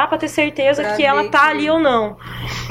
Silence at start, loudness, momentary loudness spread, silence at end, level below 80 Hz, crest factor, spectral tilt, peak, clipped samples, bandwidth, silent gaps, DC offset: 0 s; -16 LUFS; 12 LU; 0 s; -44 dBFS; 16 dB; -4.5 dB/octave; 0 dBFS; under 0.1%; 16.5 kHz; none; under 0.1%